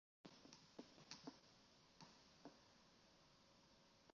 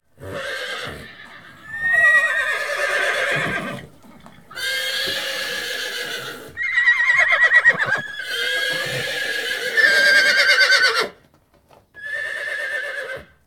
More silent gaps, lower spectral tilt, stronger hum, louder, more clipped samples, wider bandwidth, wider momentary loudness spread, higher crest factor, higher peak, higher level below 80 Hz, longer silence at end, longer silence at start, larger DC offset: neither; first, -3 dB/octave vs -1 dB/octave; neither; second, -64 LUFS vs -17 LUFS; neither; second, 7 kHz vs 19.5 kHz; second, 8 LU vs 17 LU; first, 28 dB vs 18 dB; second, -40 dBFS vs -2 dBFS; second, -88 dBFS vs -58 dBFS; second, 0 s vs 0.25 s; about the same, 0.25 s vs 0.2 s; second, under 0.1% vs 0.3%